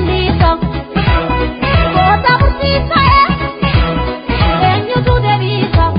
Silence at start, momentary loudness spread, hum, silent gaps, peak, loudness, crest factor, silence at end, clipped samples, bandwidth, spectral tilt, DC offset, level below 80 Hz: 0 s; 6 LU; none; none; 0 dBFS; -12 LUFS; 12 dB; 0 s; under 0.1%; 5.2 kHz; -10.5 dB/octave; under 0.1%; -18 dBFS